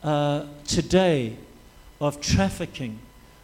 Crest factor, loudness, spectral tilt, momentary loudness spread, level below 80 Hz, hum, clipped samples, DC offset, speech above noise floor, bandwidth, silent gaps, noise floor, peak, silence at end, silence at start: 18 dB; -25 LUFS; -5 dB/octave; 15 LU; -42 dBFS; none; under 0.1%; under 0.1%; 25 dB; 16 kHz; none; -49 dBFS; -6 dBFS; 0.4 s; 0 s